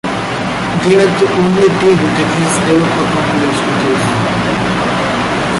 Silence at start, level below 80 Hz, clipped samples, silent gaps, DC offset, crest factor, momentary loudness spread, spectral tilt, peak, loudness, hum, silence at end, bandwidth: 0.05 s; -38 dBFS; under 0.1%; none; under 0.1%; 10 dB; 5 LU; -5 dB/octave; -2 dBFS; -12 LUFS; none; 0 s; 11.5 kHz